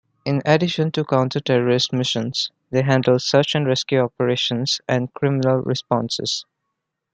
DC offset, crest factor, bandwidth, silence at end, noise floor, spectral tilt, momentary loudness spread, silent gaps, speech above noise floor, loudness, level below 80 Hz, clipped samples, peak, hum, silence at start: under 0.1%; 18 dB; 9 kHz; 0.7 s; -78 dBFS; -5 dB/octave; 6 LU; none; 59 dB; -20 LUFS; -60 dBFS; under 0.1%; -2 dBFS; none; 0.25 s